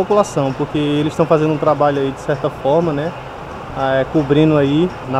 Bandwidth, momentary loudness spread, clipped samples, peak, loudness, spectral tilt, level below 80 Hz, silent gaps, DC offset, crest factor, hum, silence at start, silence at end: 12 kHz; 10 LU; under 0.1%; 0 dBFS; -16 LUFS; -7 dB/octave; -42 dBFS; none; under 0.1%; 16 dB; none; 0 s; 0 s